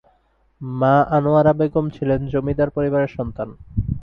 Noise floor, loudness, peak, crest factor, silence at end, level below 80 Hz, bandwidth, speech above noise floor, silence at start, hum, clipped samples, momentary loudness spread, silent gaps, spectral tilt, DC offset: -61 dBFS; -19 LUFS; -4 dBFS; 16 dB; 0 s; -38 dBFS; 5.4 kHz; 42 dB; 0.6 s; none; under 0.1%; 12 LU; none; -10.5 dB/octave; under 0.1%